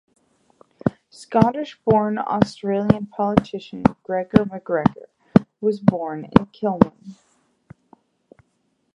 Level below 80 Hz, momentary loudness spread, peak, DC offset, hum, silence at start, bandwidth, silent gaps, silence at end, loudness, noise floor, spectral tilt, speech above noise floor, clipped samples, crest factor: -46 dBFS; 8 LU; 0 dBFS; under 0.1%; none; 0.85 s; 10.5 kHz; none; 1.85 s; -21 LUFS; -69 dBFS; -8.5 dB/octave; 49 dB; under 0.1%; 22 dB